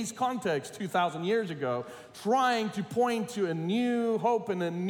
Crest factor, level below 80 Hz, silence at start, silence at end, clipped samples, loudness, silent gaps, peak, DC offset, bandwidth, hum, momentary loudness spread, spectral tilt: 14 dB; -76 dBFS; 0 s; 0 s; under 0.1%; -30 LUFS; none; -16 dBFS; under 0.1%; 18 kHz; none; 6 LU; -5.5 dB/octave